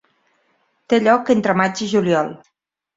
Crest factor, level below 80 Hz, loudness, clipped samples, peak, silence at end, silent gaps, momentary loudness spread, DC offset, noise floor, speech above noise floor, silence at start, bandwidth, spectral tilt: 18 dB; -62 dBFS; -17 LUFS; under 0.1%; -2 dBFS; 0.6 s; none; 5 LU; under 0.1%; -64 dBFS; 47 dB; 0.9 s; 7.8 kHz; -5.5 dB/octave